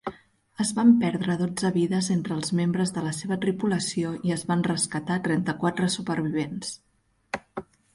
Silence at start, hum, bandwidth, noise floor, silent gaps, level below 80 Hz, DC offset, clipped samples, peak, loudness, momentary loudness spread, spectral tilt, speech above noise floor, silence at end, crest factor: 0.05 s; none; 11.5 kHz; -49 dBFS; none; -62 dBFS; under 0.1%; under 0.1%; -8 dBFS; -26 LUFS; 14 LU; -5 dB/octave; 24 dB; 0.35 s; 18 dB